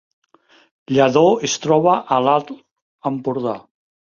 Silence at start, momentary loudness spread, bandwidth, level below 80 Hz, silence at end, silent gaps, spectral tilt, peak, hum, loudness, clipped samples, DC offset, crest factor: 0.9 s; 15 LU; 7.4 kHz; -62 dBFS; 0.5 s; 2.71-2.76 s, 2.82-2.99 s; -5 dB/octave; 0 dBFS; none; -17 LUFS; under 0.1%; under 0.1%; 18 dB